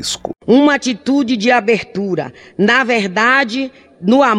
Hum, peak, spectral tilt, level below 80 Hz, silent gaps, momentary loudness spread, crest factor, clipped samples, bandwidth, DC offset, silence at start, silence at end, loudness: none; -2 dBFS; -4.5 dB/octave; -54 dBFS; none; 11 LU; 14 dB; under 0.1%; 12.5 kHz; under 0.1%; 0 s; 0 s; -14 LUFS